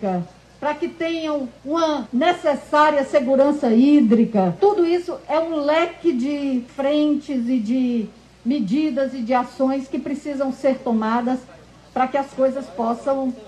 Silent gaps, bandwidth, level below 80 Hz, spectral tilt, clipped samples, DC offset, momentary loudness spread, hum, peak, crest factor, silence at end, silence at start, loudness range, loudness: none; 10 kHz; -56 dBFS; -6.5 dB/octave; under 0.1%; under 0.1%; 9 LU; none; -6 dBFS; 14 dB; 0 s; 0 s; 5 LU; -20 LUFS